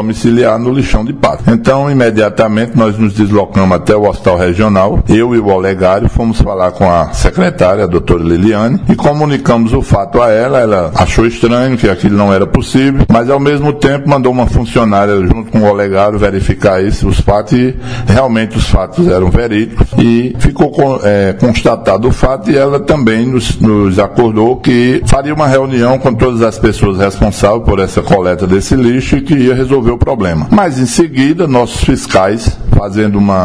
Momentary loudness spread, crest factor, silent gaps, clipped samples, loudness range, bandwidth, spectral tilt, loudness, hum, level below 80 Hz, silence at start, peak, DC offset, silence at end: 3 LU; 8 dB; none; 1%; 1 LU; 11 kHz; -7 dB/octave; -10 LUFS; none; -20 dBFS; 0 s; 0 dBFS; 2%; 0 s